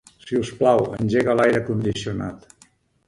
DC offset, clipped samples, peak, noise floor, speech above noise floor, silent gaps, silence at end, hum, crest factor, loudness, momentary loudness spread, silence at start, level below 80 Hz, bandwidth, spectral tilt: under 0.1%; under 0.1%; -4 dBFS; -57 dBFS; 36 dB; none; 0.7 s; none; 18 dB; -21 LUFS; 10 LU; 0.25 s; -50 dBFS; 11.5 kHz; -6.5 dB/octave